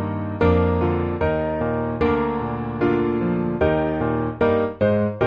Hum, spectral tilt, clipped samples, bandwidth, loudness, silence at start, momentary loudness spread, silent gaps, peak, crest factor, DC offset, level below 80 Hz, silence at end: none; -7.5 dB/octave; under 0.1%; 5.4 kHz; -21 LUFS; 0 s; 4 LU; none; -4 dBFS; 16 dB; under 0.1%; -38 dBFS; 0 s